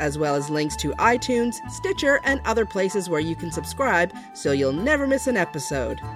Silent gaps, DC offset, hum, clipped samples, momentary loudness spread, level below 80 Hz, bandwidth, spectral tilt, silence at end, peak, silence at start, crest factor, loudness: none; under 0.1%; none; under 0.1%; 7 LU; -42 dBFS; 16 kHz; -4.5 dB/octave; 0 s; -6 dBFS; 0 s; 18 dB; -23 LUFS